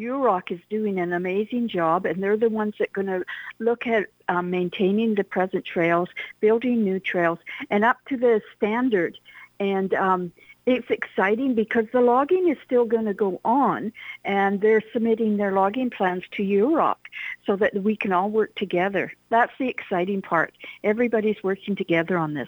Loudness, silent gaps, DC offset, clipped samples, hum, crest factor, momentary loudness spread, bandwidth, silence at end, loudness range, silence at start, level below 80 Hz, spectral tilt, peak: -23 LUFS; none; under 0.1%; under 0.1%; none; 16 dB; 7 LU; over 20 kHz; 0 s; 3 LU; 0 s; -66 dBFS; -8 dB/octave; -6 dBFS